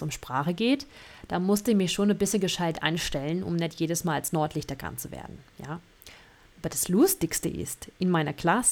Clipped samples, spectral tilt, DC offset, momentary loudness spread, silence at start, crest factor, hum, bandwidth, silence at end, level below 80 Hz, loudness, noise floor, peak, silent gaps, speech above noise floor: under 0.1%; -4.5 dB/octave; under 0.1%; 17 LU; 0 s; 20 dB; none; 19 kHz; 0 s; -52 dBFS; -27 LUFS; -54 dBFS; -8 dBFS; none; 26 dB